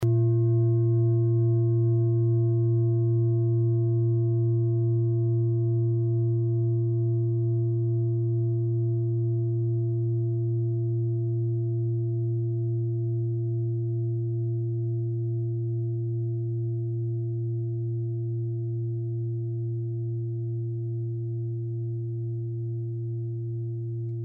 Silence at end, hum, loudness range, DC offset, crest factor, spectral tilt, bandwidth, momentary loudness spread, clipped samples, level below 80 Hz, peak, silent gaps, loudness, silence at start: 0 s; none; 7 LU; under 0.1%; 10 dB; -13.5 dB/octave; 1.2 kHz; 8 LU; under 0.1%; -68 dBFS; -16 dBFS; none; -27 LUFS; 0 s